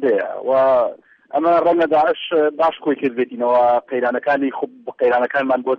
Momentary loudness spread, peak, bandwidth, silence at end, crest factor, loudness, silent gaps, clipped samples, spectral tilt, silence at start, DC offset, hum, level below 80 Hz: 6 LU; -6 dBFS; 5.8 kHz; 0 s; 10 dB; -18 LUFS; none; under 0.1%; -7 dB/octave; 0 s; under 0.1%; none; -62 dBFS